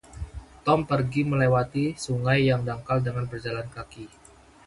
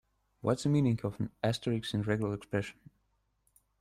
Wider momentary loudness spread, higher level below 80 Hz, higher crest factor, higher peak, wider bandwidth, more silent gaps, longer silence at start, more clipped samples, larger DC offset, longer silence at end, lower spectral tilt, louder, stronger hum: first, 18 LU vs 8 LU; first, -48 dBFS vs -62 dBFS; about the same, 20 dB vs 18 dB; first, -6 dBFS vs -16 dBFS; second, 11.5 kHz vs 13.5 kHz; neither; second, 0.1 s vs 0.45 s; neither; neither; second, 0.6 s vs 1.1 s; about the same, -7 dB/octave vs -6.5 dB/octave; first, -25 LUFS vs -33 LUFS; second, none vs 50 Hz at -55 dBFS